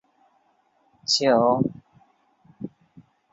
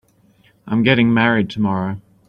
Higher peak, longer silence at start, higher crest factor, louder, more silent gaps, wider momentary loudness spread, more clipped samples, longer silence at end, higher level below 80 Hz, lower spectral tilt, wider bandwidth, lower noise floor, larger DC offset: second, -6 dBFS vs -2 dBFS; first, 1.1 s vs 0.65 s; about the same, 20 dB vs 16 dB; second, -21 LUFS vs -17 LUFS; neither; first, 21 LU vs 9 LU; neither; first, 0.65 s vs 0.3 s; second, -64 dBFS vs -52 dBFS; second, -4 dB/octave vs -8 dB/octave; first, 8.4 kHz vs 6.4 kHz; first, -65 dBFS vs -55 dBFS; neither